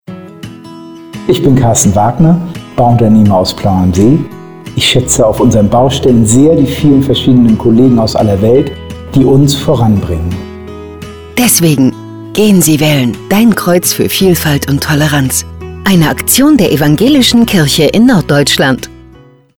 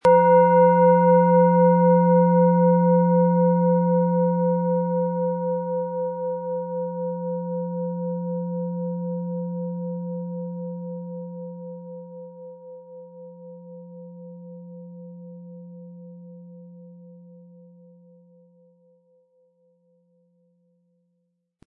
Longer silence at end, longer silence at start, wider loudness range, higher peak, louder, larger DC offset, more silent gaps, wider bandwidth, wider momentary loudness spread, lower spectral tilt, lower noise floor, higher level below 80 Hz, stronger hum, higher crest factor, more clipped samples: second, 0.7 s vs 4.55 s; about the same, 0.1 s vs 0.05 s; second, 3 LU vs 25 LU; first, 0 dBFS vs -6 dBFS; first, -8 LUFS vs -21 LUFS; neither; neither; first, over 20 kHz vs 3 kHz; second, 15 LU vs 26 LU; second, -5 dB/octave vs -11.5 dB/octave; second, -39 dBFS vs -74 dBFS; first, -30 dBFS vs -74 dBFS; neither; second, 8 dB vs 16 dB; neither